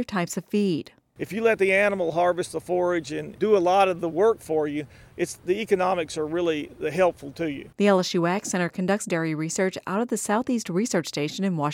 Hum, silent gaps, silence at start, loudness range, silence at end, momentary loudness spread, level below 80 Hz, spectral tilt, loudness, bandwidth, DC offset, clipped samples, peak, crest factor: none; none; 0 s; 3 LU; 0 s; 10 LU; -62 dBFS; -5 dB/octave; -25 LUFS; 17 kHz; under 0.1%; under 0.1%; -8 dBFS; 16 dB